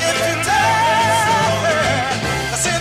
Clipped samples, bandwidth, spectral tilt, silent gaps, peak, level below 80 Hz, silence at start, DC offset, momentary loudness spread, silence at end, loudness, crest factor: under 0.1%; 16 kHz; -3 dB/octave; none; -6 dBFS; -40 dBFS; 0 s; under 0.1%; 5 LU; 0 s; -16 LUFS; 10 dB